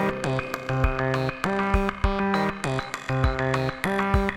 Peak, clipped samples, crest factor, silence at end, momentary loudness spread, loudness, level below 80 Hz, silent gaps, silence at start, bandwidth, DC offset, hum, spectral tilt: -6 dBFS; under 0.1%; 18 dB; 0 s; 5 LU; -25 LUFS; -32 dBFS; none; 0 s; 15.5 kHz; under 0.1%; none; -6.5 dB/octave